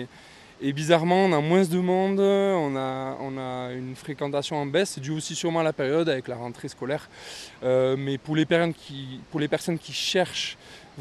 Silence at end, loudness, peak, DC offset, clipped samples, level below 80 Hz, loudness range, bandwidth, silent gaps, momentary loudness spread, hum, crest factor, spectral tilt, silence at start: 0 s; -25 LUFS; -6 dBFS; under 0.1%; under 0.1%; -64 dBFS; 4 LU; 13.5 kHz; none; 14 LU; none; 20 dB; -5.5 dB/octave; 0 s